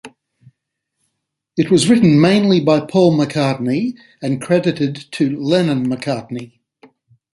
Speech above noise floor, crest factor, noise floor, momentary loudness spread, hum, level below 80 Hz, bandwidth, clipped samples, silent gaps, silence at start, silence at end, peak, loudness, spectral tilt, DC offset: 61 dB; 14 dB; -76 dBFS; 13 LU; none; -56 dBFS; 11.5 kHz; under 0.1%; none; 0.05 s; 0.85 s; -2 dBFS; -16 LUFS; -6.5 dB/octave; under 0.1%